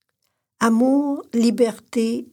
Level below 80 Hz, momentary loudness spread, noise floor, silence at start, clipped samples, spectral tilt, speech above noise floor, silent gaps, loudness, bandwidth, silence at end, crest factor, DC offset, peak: -70 dBFS; 6 LU; -74 dBFS; 0.6 s; under 0.1%; -5.5 dB/octave; 54 dB; none; -20 LUFS; 15.5 kHz; 0.1 s; 16 dB; under 0.1%; -4 dBFS